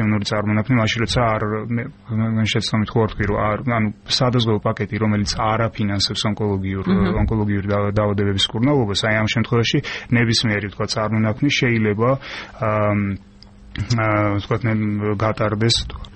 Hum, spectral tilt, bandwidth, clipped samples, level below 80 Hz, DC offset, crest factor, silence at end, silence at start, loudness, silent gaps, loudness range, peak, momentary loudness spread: none; -5.5 dB/octave; 8.8 kHz; under 0.1%; -38 dBFS; under 0.1%; 14 dB; 0 s; 0 s; -19 LUFS; none; 2 LU; -6 dBFS; 5 LU